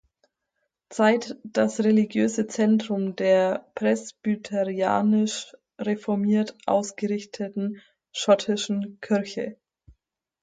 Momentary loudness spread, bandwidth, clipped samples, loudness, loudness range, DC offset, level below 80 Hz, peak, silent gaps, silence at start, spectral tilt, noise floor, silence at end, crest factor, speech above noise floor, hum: 11 LU; 9.2 kHz; under 0.1%; -25 LUFS; 4 LU; under 0.1%; -70 dBFS; -8 dBFS; none; 0.9 s; -5.5 dB/octave; -79 dBFS; 0.9 s; 18 dB; 55 dB; none